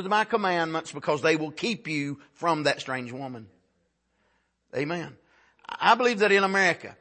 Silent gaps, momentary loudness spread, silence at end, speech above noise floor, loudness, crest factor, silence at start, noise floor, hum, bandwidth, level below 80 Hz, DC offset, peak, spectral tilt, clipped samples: none; 16 LU; 0.05 s; 47 dB; -25 LUFS; 22 dB; 0 s; -73 dBFS; none; 8.8 kHz; -74 dBFS; under 0.1%; -6 dBFS; -4.5 dB/octave; under 0.1%